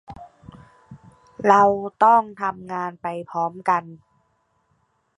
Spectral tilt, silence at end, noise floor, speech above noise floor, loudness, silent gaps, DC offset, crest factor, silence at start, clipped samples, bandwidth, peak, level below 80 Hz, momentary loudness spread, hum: -6.5 dB/octave; 1.2 s; -67 dBFS; 47 dB; -20 LUFS; none; under 0.1%; 22 dB; 0.1 s; under 0.1%; 10.5 kHz; 0 dBFS; -62 dBFS; 14 LU; none